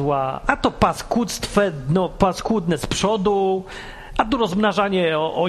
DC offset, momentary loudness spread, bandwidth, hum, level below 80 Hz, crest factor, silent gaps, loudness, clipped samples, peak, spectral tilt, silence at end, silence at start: under 0.1%; 4 LU; 13 kHz; none; -38 dBFS; 20 dB; none; -20 LUFS; under 0.1%; 0 dBFS; -5 dB/octave; 0 s; 0 s